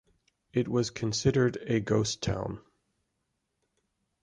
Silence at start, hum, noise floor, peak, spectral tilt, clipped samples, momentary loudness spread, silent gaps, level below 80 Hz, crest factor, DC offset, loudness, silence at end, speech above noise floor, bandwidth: 0.55 s; none; -80 dBFS; -12 dBFS; -5.5 dB/octave; under 0.1%; 9 LU; none; -54 dBFS; 20 dB; under 0.1%; -29 LUFS; 1.6 s; 52 dB; 11 kHz